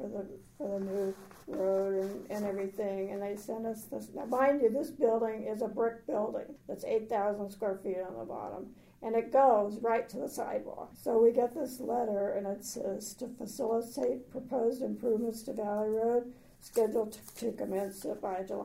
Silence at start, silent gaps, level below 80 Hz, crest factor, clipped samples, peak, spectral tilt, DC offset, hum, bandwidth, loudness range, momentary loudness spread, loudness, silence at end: 0 s; none; -68 dBFS; 20 dB; under 0.1%; -14 dBFS; -5.5 dB/octave; under 0.1%; none; 16 kHz; 5 LU; 14 LU; -33 LUFS; 0 s